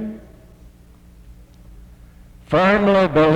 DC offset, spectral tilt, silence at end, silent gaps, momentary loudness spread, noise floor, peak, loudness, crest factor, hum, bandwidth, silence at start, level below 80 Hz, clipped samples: under 0.1%; -7.5 dB/octave; 0 s; none; 19 LU; -46 dBFS; -4 dBFS; -16 LUFS; 16 dB; none; 9.6 kHz; 0 s; -42 dBFS; under 0.1%